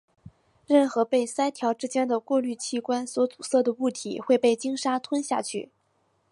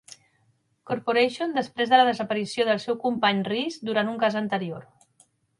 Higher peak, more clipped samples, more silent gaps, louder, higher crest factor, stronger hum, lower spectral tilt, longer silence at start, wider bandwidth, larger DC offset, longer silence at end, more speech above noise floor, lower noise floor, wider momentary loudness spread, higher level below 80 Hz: about the same, -8 dBFS vs -6 dBFS; neither; neither; about the same, -26 LUFS vs -24 LUFS; about the same, 18 dB vs 20 dB; neither; second, -3.5 dB/octave vs -5 dB/octave; second, 0.25 s vs 0.85 s; about the same, 11.5 kHz vs 11.5 kHz; neither; about the same, 0.65 s vs 0.75 s; about the same, 45 dB vs 43 dB; about the same, -70 dBFS vs -68 dBFS; about the same, 8 LU vs 10 LU; about the same, -72 dBFS vs -72 dBFS